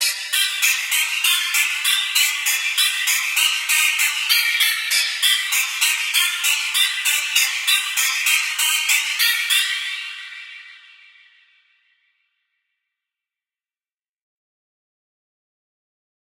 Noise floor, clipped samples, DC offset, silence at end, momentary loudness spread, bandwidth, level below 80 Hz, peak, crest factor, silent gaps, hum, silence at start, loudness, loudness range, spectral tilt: under -90 dBFS; under 0.1%; under 0.1%; 5.6 s; 3 LU; 17 kHz; -90 dBFS; -2 dBFS; 20 dB; none; none; 0 s; -17 LUFS; 6 LU; 8 dB/octave